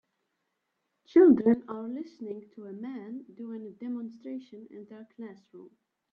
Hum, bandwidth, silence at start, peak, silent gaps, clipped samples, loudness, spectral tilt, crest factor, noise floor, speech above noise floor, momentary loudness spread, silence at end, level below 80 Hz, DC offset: none; 5.4 kHz; 1.15 s; -10 dBFS; none; under 0.1%; -26 LUFS; -9.5 dB/octave; 20 dB; -81 dBFS; 52 dB; 26 LU; 0.45 s; -74 dBFS; under 0.1%